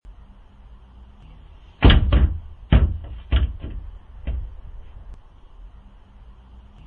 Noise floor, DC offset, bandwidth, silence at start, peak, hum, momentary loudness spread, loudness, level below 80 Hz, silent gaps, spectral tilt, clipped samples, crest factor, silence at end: -45 dBFS; under 0.1%; 4.7 kHz; 0.1 s; 0 dBFS; none; 27 LU; -21 LUFS; -24 dBFS; none; -9.5 dB/octave; under 0.1%; 22 dB; 1.2 s